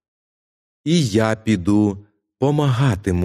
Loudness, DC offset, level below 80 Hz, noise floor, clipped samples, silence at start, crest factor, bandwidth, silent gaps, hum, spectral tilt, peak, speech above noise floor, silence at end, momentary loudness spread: -19 LUFS; under 0.1%; -46 dBFS; under -90 dBFS; under 0.1%; 0.85 s; 16 dB; 13 kHz; none; none; -6.5 dB/octave; -2 dBFS; over 73 dB; 0 s; 6 LU